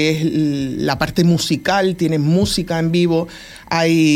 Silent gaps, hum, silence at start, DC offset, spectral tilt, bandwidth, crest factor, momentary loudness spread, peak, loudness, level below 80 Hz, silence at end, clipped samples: none; none; 0 s; under 0.1%; -5.5 dB/octave; 15.5 kHz; 16 dB; 5 LU; -2 dBFS; -17 LUFS; -42 dBFS; 0 s; under 0.1%